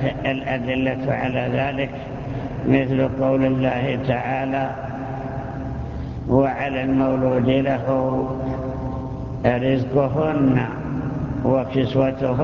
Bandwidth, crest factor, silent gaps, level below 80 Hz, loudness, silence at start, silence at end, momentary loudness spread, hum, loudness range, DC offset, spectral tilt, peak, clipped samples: 6.8 kHz; 18 dB; none; -38 dBFS; -22 LUFS; 0 s; 0 s; 10 LU; none; 2 LU; under 0.1%; -9 dB/octave; -2 dBFS; under 0.1%